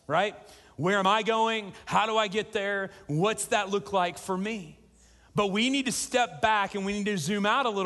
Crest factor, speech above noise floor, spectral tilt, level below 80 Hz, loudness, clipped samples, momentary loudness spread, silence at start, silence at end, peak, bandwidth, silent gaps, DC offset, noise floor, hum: 18 dB; 30 dB; -4 dB/octave; -62 dBFS; -27 LUFS; under 0.1%; 7 LU; 0.1 s; 0 s; -10 dBFS; 12.5 kHz; none; under 0.1%; -58 dBFS; none